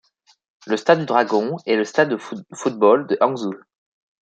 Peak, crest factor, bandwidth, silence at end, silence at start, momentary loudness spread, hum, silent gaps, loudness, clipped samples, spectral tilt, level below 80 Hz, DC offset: -2 dBFS; 18 dB; 9.2 kHz; 0.65 s; 0.65 s; 12 LU; none; none; -19 LUFS; under 0.1%; -5.5 dB/octave; -72 dBFS; under 0.1%